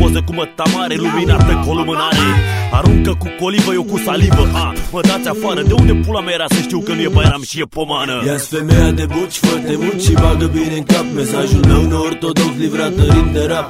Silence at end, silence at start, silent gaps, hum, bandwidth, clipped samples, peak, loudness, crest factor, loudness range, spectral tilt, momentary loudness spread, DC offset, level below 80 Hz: 0 s; 0 s; none; none; 16 kHz; under 0.1%; 0 dBFS; -14 LUFS; 12 dB; 1 LU; -5.5 dB/octave; 6 LU; 0.1%; -20 dBFS